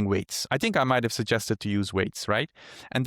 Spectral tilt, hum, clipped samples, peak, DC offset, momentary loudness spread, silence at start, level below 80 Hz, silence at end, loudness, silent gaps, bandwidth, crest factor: -4.5 dB/octave; none; under 0.1%; -10 dBFS; under 0.1%; 6 LU; 0 s; -60 dBFS; 0 s; -27 LUFS; none; 18.5 kHz; 16 dB